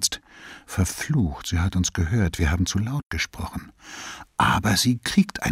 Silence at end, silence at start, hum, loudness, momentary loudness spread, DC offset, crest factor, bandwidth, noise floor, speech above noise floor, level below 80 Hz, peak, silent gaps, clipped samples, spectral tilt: 0 s; 0 s; none; -24 LUFS; 16 LU; under 0.1%; 18 dB; 16 kHz; -45 dBFS; 22 dB; -36 dBFS; -6 dBFS; 3.06-3.10 s; under 0.1%; -4 dB/octave